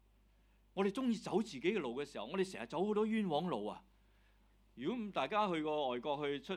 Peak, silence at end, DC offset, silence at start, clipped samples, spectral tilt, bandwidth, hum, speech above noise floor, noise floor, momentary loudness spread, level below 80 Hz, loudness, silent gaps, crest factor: -22 dBFS; 0 s; under 0.1%; 0.75 s; under 0.1%; -6 dB/octave; 12.5 kHz; none; 32 dB; -69 dBFS; 7 LU; -70 dBFS; -38 LUFS; none; 18 dB